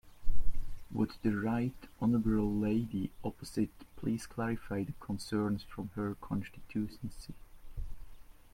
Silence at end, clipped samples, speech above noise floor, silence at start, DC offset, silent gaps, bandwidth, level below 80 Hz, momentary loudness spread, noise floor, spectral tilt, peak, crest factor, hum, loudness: 0.3 s; under 0.1%; 14 dB; 0.05 s; under 0.1%; none; 15 kHz; -44 dBFS; 17 LU; -50 dBFS; -7.5 dB/octave; -14 dBFS; 18 dB; none; -36 LUFS